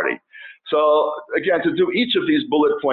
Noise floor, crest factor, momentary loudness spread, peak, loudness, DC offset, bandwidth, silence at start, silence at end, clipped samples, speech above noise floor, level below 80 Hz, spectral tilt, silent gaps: -43 dBFS; 12 dB; 7 LU; -6 dBFS; -19 LUFS; under 0.1%; 4.5 kHz; 0 s; 0 s; under 0.1%; 24 dB; -62 dBFS; -8 dB/octave; none